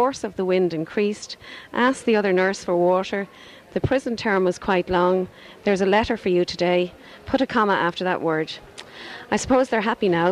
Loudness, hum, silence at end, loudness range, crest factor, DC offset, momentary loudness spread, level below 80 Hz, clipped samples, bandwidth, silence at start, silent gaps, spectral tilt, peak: -22 LUFS; none; 0 s; 1 LU; 16 dB; under 0.1%; 14 LU; -48 dBFS; under 0.1%; 11.5 kHz; 0 s; none; -5.5 dB/octave; -6 dBFS